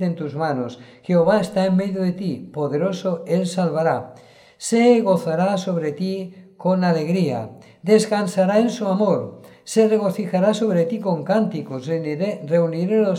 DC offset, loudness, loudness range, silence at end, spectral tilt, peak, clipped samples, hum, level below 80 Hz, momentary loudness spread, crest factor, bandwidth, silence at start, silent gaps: under 0.1%; -20 LUFS; 2 LU; 0 s; -6.5 dB/octave; -4 dBFS; under 0.1%; none; -66 dBFS; 10 LU; 16 dB; 13.5 kHz; 0 s; none